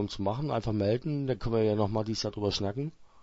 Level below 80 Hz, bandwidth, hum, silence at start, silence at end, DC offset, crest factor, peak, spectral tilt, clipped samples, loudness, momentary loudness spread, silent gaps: -50 dBFS; 8 kHz; none; 0 s; 0 s; under 0.1%; 16 dB; -14 dBFS; -6.5 dB/octave; under 0.1%; -31 LUFS; 5 LU; none